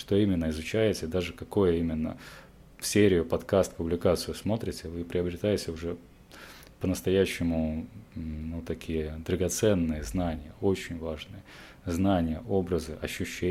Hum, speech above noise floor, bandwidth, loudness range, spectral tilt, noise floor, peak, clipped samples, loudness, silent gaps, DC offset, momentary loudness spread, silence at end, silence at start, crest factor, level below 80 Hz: none; 20 dB; 16.5 kHz; 4 LU; -5.5 dB/octave; -49 dBFS; -10 dBFS; under 0.1%; -29 LUFS; none; under 0.1%; 15 LU; 0 s; 0 s; 20 dB; -48 dBFS